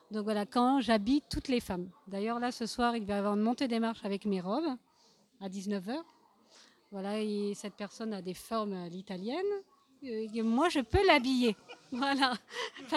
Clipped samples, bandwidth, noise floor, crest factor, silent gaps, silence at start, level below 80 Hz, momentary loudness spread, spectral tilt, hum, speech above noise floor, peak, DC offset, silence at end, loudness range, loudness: under 0.1%; 14.5 kHz; -67 dBFS; 22 dB; none; 0.1 s; -54 dBFS; 13 LU; -5 dB/octave; none; 34 dB; -10 dBFS; under 0.1%; 0 s; 8 LU; -33 LUFS